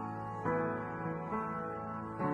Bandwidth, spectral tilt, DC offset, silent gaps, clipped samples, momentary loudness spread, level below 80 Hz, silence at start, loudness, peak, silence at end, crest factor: 9.2 kHz; -9.5 dB/octave; under 0.1%; none; under 0.1%; 6 LU; -64 dBFS; 0 s; -38 LUFS; -22 dBFS; 0 s; 16 dB